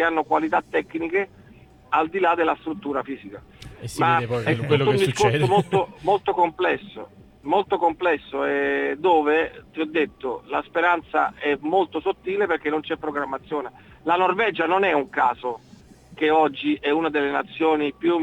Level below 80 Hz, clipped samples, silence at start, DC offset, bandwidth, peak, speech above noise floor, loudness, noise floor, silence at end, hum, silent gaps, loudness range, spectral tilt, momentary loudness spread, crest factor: -56 dBFS; under 0.1%; 0 s; under 0.1%; 14.5 kHz; -4 dBFS; 27 dB; -22 LUFS; -49 dBFS; 0 s; none; none; 3 LU; -6 dB/octave; 11 LU; 18 dB